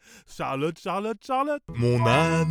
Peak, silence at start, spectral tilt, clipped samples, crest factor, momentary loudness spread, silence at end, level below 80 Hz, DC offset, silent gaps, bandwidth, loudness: -8 dBFS; 0.3 s; -6.5 dB/octave; under 0.1%; 16 dB; 10 LU; 0 s; -52 dBFS; under 0.1%; none; 13.5 kHz; -25 LUFS